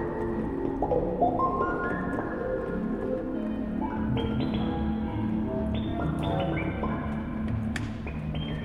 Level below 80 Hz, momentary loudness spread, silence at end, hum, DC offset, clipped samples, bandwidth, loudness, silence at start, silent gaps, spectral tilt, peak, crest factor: -40 dBFS; 5 LU; 0 s; none; under 0.1%; under 0.1%; 11 kHz; -30 LUFS; 0 s; none; -8.5 dB/octave; -12 dBFS; 16 dB